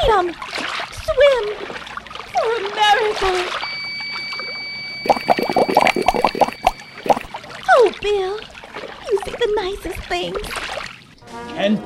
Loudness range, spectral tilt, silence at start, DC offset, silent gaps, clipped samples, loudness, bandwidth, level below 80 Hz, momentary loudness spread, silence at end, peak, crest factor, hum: 6 LU; -4 dB/octave; 0 s; under 0.1%; none; under 0.1%; -19 LUFS; 16 kHz; -40 dBFS; 16 LU; 0 s; 0 dBFS; 20 dB; none